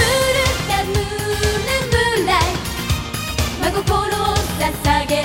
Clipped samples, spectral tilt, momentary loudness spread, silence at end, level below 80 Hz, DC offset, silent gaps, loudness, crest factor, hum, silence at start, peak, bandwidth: under 0.1%; -4 dB/octave; 6 LU; 0 s; -28 dBFS; 0.1%; none; -18 LUFS; 16 dB; none; 0 s; -2 dBFS; 16.5 kHz